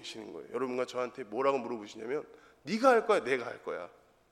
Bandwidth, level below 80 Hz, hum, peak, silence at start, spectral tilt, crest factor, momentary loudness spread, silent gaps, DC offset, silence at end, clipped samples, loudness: 13 kHz; -76 dBFS; none; -10 dBFS; 0 s; -4.5 dB/octave; 24 dB; 17 LU; none; under 0.1%; 0.45 s; under 0.1%; -32 LUFS